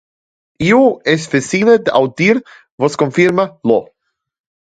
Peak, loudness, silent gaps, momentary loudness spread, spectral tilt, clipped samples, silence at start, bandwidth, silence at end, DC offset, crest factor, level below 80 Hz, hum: 0 dBFS; -14 LUFS; 2.72-2.78 s; 7 LU; -5.5 dB/octave; under 0.1%; 0.6 s; 9.4 kHz; 0.85 s; under 0.1%; 14 dB; -52 dBFS; none